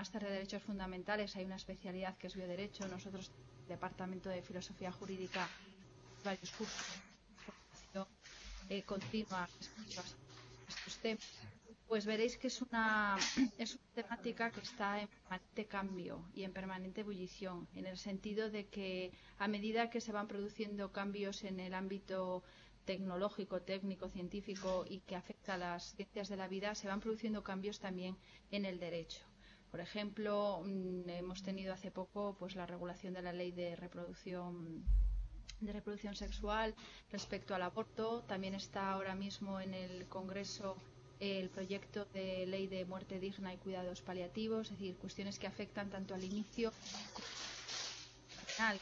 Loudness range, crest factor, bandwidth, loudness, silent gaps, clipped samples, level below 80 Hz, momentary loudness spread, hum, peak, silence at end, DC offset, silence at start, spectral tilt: 7 LU; 20 dB; 7.8 kHz; -44 LUFS; none; under 0.1%; -54 dBFS; 11 LU; none; -22 dBFS; 0 s; under 0.1%; 0 s; -4.5 dB/octave